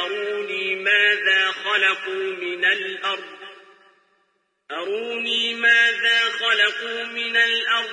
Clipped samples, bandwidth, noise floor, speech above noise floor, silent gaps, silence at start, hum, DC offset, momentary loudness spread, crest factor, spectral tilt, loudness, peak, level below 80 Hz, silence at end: under 0.1%; 10.5 kHz; -69 dBFS; 47 dB; none; 0 s; none; under 0.1%; 11 LU; 16 dB; -0.5 dB/octave; -19 LUFS; -6 dBFS; under -90 dBFS; 0 s